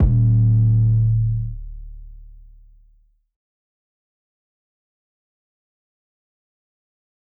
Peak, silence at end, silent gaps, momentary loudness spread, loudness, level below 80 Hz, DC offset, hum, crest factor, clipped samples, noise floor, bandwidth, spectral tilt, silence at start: -8 dBFS; 5.05 s; none; 22 LU; -17 LUFS; -32 dBFS; under 0.1%; none; 14 dB; under 0.1%; -57 dBFS; 1.1 kHz; -14 dB/octave; 0 s